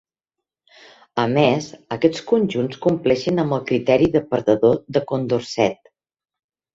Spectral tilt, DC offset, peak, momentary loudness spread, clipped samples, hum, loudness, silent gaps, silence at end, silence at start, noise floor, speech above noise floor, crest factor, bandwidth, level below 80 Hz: -6.5 dB/octave; under 0.1%; -2 dBFS; 6 LU; under 0.1%; none; -20 LUFS; none; 1 s; 1.15 s; -85 dBFS; 66 dB; 18 dB; 7.8 kHz; -54 dBFS